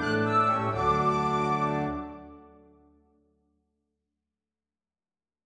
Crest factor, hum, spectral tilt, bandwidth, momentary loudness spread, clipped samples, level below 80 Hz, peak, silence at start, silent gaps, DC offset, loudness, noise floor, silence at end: 18 dB; none; -6.5 dB/octave; 10 kHz; 13 LU; under 0.1%; -52 dBFS; -14 dBFS; 0 s; none; under 0.1%; -26 LUFS; under -90 dBFS; 3.05 s